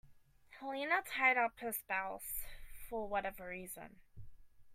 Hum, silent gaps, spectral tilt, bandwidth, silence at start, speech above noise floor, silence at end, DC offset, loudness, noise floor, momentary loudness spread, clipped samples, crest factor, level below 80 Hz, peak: none; none; -2.5 dB/octave; 16 kHz; 0.05 s; 24 dB; 0 s; under 0.1%; -37 LUFS; -63 dBFS; 19 LU; under 0.1%; 22 dB; -60 dBFS; -18 dBFS